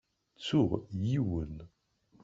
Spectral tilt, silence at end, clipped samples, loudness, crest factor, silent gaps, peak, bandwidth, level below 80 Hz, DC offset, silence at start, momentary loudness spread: -7.5 dB/octave; 0.55 s; under 0.1%; -33 LUFS; 18 dB; none; -14 dBFS; 7.8 kHz; -54 dBFS; under 0.1%; 0.4 s; 13 LU